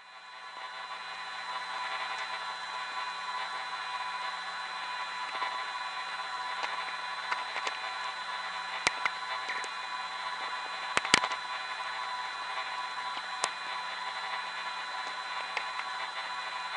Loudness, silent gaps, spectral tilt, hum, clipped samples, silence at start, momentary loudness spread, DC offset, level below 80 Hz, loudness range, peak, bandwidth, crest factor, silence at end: -34 LUFS; none; 0 dB/octave; none; under 0.1%; 0 s; 5 LU; under 0.1%; -74 dBFS; 4 LU; -2 dBFS; 10 kHz; 34 dB; 0 s